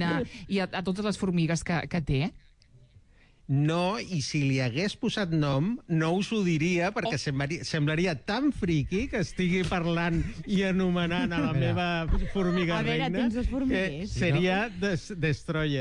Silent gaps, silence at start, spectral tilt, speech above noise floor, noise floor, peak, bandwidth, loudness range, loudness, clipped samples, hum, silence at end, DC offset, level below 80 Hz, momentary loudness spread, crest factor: none; 0 s; -6 dB/octave; 31 dB; -58 dBFS; -16 dBFS; 10.5 kHz; 2 LU; -28 LUFS; under 0.1%; none; 0 s; under 0.1%; -42 dBFS; 4 LU; 12 dB